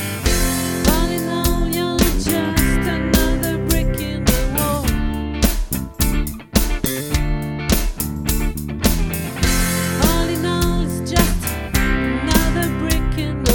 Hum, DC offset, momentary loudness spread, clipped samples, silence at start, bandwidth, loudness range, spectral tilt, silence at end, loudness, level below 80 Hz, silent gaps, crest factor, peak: none; under 0.1%; 5 LU; under 0.1%; 0 s; 17.5 kHz; 3 LU; -4.5 dB/octave; 0 s; -19 LUFS; -22 dBFS; none; 18 dB; 0 dBFS